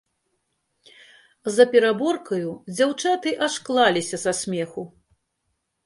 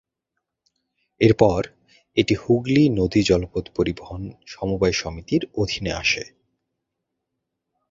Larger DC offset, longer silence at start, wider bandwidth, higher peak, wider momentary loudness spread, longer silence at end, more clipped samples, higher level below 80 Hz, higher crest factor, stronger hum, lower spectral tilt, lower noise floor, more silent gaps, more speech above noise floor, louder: neither; first, 1.45 s vs 1.2 s; first, 11.5 kHz vs 7.8 kHz; about the same, -2 dBFS vs -2 dBFS; about the same, 14 LU vs 14 LU; second, 1 s vs 1.65 s; neither; second, -68 dBFS vs -42 dBFS; about the same, 22 dB vs 22 dB; neither; second, -3.5 dB/octave vs -5.5 dB/octave; second, -75 dBFS vs -81 dBFS; neither; second, 54 dB vs 60 dB; about the same, -22 LUFS vs -21 LUFS